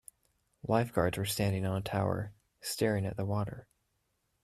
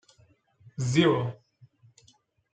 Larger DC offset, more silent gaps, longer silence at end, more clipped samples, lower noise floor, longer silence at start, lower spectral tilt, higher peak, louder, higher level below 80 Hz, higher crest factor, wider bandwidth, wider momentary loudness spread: neither; neither; second, 0.8 s vs 1.2 s; neither; first, -79 dBFS vs -64 dBFS; second, 0.65 s vs 0.8 s; about the same, -5.5 dB/octave vs -6 dB/octave; second, -14 dBFS vs -8 dBFS; second, -33 LUFS vs -26 LUFS; first, -58 dBFS vs -66 dBFS; about the same, 20 dB vs 22 dB; first, 14.5 kHz vs 9.2 kHz; second, 11 LU vs 22 LU